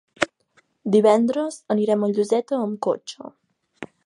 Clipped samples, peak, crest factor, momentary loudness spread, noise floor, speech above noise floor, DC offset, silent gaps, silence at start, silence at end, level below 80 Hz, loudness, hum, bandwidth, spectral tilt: under 0.1%; 0 dBFS; 22 dB; 22 LU; -63 dBFS; 42 dB; under 0.1%; none; 0.2 s; 0.2 s; -66 dBFS; -21 LUFS; none; 11 kHz; -5.5 dB/octave